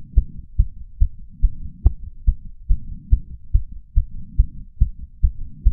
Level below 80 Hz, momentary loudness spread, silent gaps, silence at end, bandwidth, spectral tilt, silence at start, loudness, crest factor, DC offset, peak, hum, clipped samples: -20 dBFS; 4 LU; none; 0 s; 0.9 kHz; -15.5 dB/octave; 0 s; -26 LUFS; 20 dB; under 0.1%; 0 dBFS; none; under 0.1%